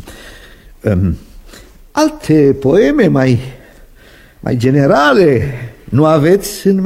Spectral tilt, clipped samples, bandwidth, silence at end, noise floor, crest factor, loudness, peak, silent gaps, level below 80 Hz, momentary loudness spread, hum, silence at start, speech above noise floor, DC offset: -7 dB/octave; under 0.1%; 16 kHz; 0 s; -41 dBFS; 12 dB; -12 LUFS; 0 dBFS; none; -36 dBFS; 13 LU; none; 0.05 s; 31 dB; under 0.1%